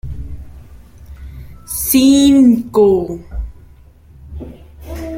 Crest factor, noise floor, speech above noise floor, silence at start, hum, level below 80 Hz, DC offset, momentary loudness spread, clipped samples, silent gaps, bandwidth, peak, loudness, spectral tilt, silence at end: 16 dB; -42 dBFS; 32 dB; 0.05 s; none; -32 dBFS; under 0.1%; 26 LU; under 0.1%; none; 16.5 kHz; 0 dBFS; -12 LUFS; -5 dB/octave; 0 s